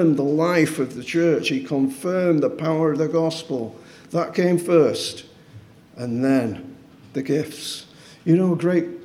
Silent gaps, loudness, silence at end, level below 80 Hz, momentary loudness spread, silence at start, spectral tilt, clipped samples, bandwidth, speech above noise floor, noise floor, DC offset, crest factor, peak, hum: none; -21 LUFS; 0 s; -66 dBFS; 13 LU; 0 s; -6 dB/octave; under 0.1%; 15.5 kHz; 25 dB; -46 dBFS; under 0.1%; 18 dB; -4 dBFS; none